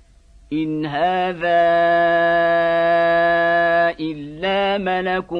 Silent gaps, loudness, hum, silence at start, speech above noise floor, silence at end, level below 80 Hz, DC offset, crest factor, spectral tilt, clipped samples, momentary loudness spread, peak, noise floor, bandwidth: none; -18 LUFS; none; 0.5 s; 31 dB; 0 s; -50 dBFS; under 0.1%; 12 dB; -7 dB/octave; under 0.1%; 9 LU; -6 dBFS; -48 dBFS; 5.4 kHz